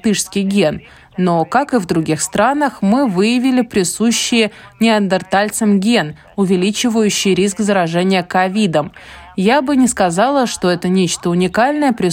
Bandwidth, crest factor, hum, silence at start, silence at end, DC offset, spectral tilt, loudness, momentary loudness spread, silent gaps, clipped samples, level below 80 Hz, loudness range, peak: 16 kHz; 14 dB; none; 0.05 s; 0 s; under 0.1%; -4.5 dB/octave; -15 LUFS; 4 LU; none; under 0.1%; -48 dBFS; 1 LU; 0 dBFS